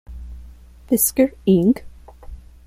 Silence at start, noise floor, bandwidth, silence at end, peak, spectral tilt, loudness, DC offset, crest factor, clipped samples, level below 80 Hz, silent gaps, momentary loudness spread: 0.1 s; -42 dBFS; 16 kHz; 0.3 s; -4 dBFS; -5.5 dB/octave; -18 LUFS; under 0.1%; 18 dB; under 0.1%; -40 dBFS; none; 22 LU